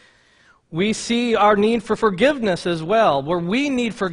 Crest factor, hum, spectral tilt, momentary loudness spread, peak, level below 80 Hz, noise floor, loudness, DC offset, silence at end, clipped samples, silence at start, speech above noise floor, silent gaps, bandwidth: 16 dB; none; -5 dB/octave; 6 LU; -4 dBFS; -52 dBFS; -55 dBFS; -19 LUFS; under 0.1%; 0 s; under 0.1%; 0.7 s; 37 dB; none; 10.5 kHz